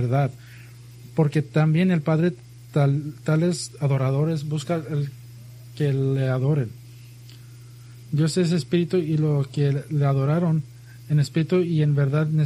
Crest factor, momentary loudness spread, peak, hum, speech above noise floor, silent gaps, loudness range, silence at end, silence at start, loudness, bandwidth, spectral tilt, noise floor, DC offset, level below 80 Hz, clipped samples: 16 dB; 14 LU; -8 dBFS; none; 22 dB; none; 4 LU; 0 s; 0 s; -23 LUFS; 12 kHz; -7.5 dB/octave; -43 dBFS; under 0.1%; -60 dBFS; under 0.1%